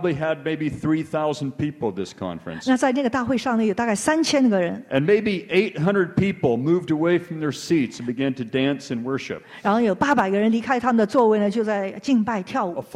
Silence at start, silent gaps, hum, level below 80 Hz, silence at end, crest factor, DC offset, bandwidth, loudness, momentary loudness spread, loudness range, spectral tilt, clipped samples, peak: 0 s; none; none; -56 dBFS; 0 s; 16 dB; under 0.1%; 13 kHz; -22 LUFS; 8 LU; 3 LU; -6 dB/octave; under 0.1%; -6 dBFS